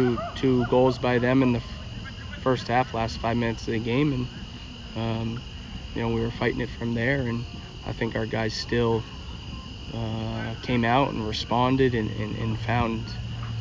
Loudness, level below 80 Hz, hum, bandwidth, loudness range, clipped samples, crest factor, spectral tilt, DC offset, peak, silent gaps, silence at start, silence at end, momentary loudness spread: -26 LUFS; -42 dBFS; none; 7.6 kHz; 4 LU; under 0.1%; 18 dB; -6.5 dB/octave; under 0.1%; -8 dBFS; none; 0 s; 0 s; 15 LU